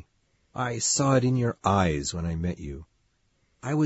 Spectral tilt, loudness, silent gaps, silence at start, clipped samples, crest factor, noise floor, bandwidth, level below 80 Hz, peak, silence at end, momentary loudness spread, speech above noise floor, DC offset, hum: -5 dB/octave; -26 LUFS; none; 0.55 s; under 0.1%; 18 dB; -69 dBFS; 8 kHz; -46 dBFS; -8 dBFS; 0 s; 17 LU; 44 dB; under 0.1%; none